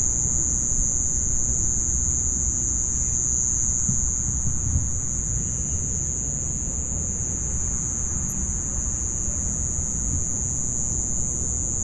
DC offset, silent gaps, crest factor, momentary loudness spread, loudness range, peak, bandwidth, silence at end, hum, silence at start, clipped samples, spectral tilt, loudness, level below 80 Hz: under 0.1%; none; 14 dB; 4 LU; 3 LU; -10 dBFS; 12 kHz; 0 s; none; 0 s; under 0.1%; -4.5 dB/octave; -23 LUFS; -32 dBFS